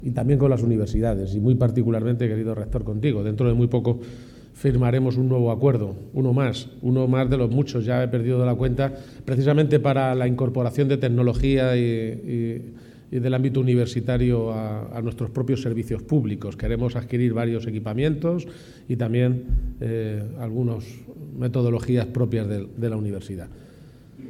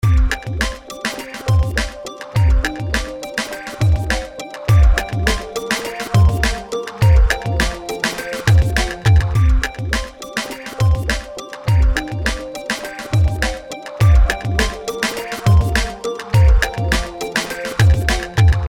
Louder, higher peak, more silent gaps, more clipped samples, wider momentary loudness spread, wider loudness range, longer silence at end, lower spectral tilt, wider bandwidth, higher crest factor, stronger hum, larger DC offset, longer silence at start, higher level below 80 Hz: second, -23 LUFS vs -18 LUFS; second, -6 dBFS vs 0 dBFS; neither; neither; about the same, 9 LU vs 10 LU; about the same, 4 LU vs 4 LU; about the same, 0 s vs 0 s; first, -8.5 dB/octave vs -5 dB/octave; second, 11 kHz vs 16.5 kHz; about the same, 16 dB vs 16 dB; neither; second, under 0.1% vs 0.2%; about the same, 0 s vs 0.05 s; second, -38 dBFS vs -20 dBFS